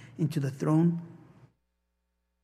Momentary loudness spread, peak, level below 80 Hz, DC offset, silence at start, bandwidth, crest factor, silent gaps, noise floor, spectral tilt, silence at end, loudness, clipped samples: 13 LU; -14 dBFS; -72 dBFS; under 0.1%; 0 s; 13 kHz; 16 dB; none; -79 dBFS; -8.5 dB/octave; 1.25 s; -29 LUFS; under 0.1%